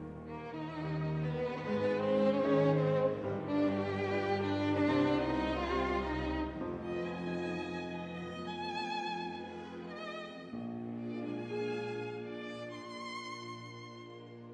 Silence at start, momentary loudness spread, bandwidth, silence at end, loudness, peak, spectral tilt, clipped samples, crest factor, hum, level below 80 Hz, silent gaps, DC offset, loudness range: 0 s; 14 LU; 9.8 kHz; 0 s; -36 LUFS; -18 dBFS; -7 dB/octave; under 0.1%; 16 dB; none; -54 dBFS; none; under 0.1%; 9 LU